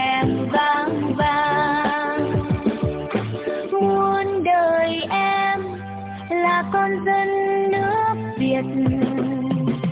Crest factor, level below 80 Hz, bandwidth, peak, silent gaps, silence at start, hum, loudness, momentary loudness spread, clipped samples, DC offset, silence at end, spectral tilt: 14 dB; -44 dBFS; 4 kHz; -8 dBFS; none; 0 s; none; -21 LUFS; 7 LU; under 0.1%; under 0.1%; 0 s; -10 dB/octave